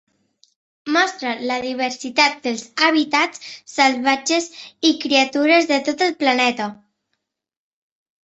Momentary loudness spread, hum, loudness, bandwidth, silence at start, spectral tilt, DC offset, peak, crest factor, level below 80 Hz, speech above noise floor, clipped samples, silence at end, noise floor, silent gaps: 10 LU; none; -18 LUFS; 8.4 kHz; 0.85 s; -1.5 dB/octave; under 0.1%; -2 dBFS; 18 dB; -68 dBFS; 57 dB; under 0.1%; 1.5 s; -76 dBFS; none